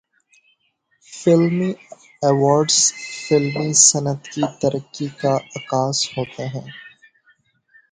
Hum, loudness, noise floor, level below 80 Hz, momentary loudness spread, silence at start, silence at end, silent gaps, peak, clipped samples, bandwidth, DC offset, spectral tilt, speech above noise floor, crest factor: none; -18 LUFS; -66 dBFS; -62 dBFS; 17 LU; 1.1 s; 1.05 s; none; 0 dBFS; under 0.1%; 9.6 kHz; under 0.1%; -3.5 dB/octave; 47 dB; 20 dB